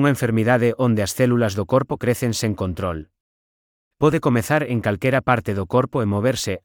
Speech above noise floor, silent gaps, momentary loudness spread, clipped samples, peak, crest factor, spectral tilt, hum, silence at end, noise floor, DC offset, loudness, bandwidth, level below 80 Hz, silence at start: over 70 dB; 3.20-3.91 s; 5 LU; under 0.1%; -2 dBFS; 18 dB; -6 dB/octave; none; 0.05 s; under -90 dBFS; under 0.1%; -20 LUFS; 19.5 kHz; -50 dBFS; 0 s